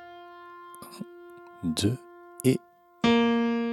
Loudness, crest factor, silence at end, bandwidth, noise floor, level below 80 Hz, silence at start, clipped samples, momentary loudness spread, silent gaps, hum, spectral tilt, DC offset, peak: -27 LUFS; 20 dB; 0 s; 14.5 kHz; -48 dBFS; -60 dBFS; 0 s; under 0.1%; 23 LU; none; none; -5.5 dB/octave; under 0.1%; -10 dBFS